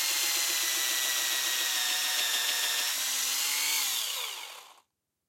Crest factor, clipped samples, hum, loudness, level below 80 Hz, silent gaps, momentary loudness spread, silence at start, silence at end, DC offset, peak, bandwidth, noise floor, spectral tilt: 16 dB; under 0.1%; none; -27 LUFS; under -90 dBFS; none; 5 LU; 0 s; 0.55 s; under 0.1%; -14 dBFS; 16.5 kHz; -70 dBFS; 4.5 dB/octave